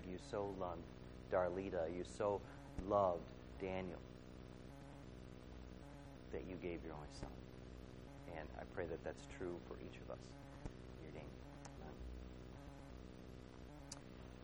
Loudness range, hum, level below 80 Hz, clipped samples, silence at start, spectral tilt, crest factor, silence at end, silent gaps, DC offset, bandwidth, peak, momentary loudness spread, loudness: 13 LU; none; -60 dBFS; under 0.1%; 0 s; -6.5 dB/octave; 24 dB; 0 s; none; under 0.1%; over 20 kHz; -24 dBFS; 16 LU; -48 LUFS